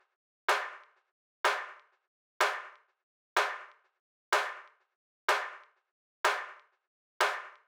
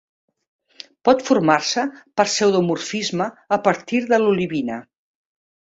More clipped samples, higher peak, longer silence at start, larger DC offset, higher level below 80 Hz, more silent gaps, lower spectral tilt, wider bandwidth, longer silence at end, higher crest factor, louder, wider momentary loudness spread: neither; second, -12 dBFS vs -2 dBFS; second, 0.5 s vs 1.05 s; neither; second, under -90 dBFS vs -62 dBFS; first, 1.12-1.44 s, 2.07-2.40 s, 3.03-3.36 s, 3.99-4.32 s, 4.95-5.28 s, 5.91-6.24 s, 6.87-7.20 s vs none; second, 1.5 dB/octave vs -4.5 dB/octave; first, over 20 kHz vs 8 kHz; second, 0.15 s vs 0.85 s; about the same, 24 dB vs 20 dB; second, -32 LUFS vs -19 LUFS; first, 15 LU vs 8 LU